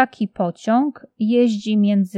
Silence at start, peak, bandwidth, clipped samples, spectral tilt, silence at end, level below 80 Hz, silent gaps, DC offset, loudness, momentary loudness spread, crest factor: 0 s; -2 dBFS; 8.4 kHz; under 0.1%; -7 dB/octave; 0 s; -68 dBFS; none; under 0.1%; -19 LUFS; 7 LU; 16 dB